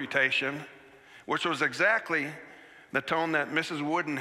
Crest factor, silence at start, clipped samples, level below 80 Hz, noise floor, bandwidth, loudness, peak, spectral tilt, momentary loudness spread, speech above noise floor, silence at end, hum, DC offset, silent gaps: 20 dB; 0 s; under 0.1%; -76 dBFS; -54 dBFS; 14.5 kHz; -28 LUFS; -10 dBFS; -4 dB/octave; 19 LU; 25 dB; 0 s; none; under 0.1%; none